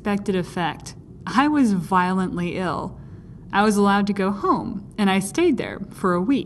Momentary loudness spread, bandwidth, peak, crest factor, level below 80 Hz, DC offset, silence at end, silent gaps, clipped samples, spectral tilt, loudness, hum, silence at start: 16 LU; 12.5 kHz; -6 dBFS; 16 dB; -48 dBFS; under 0.1%; 0 s; none; under 0.1%; -6 dB/octave; -22 LUFS; none; 0 s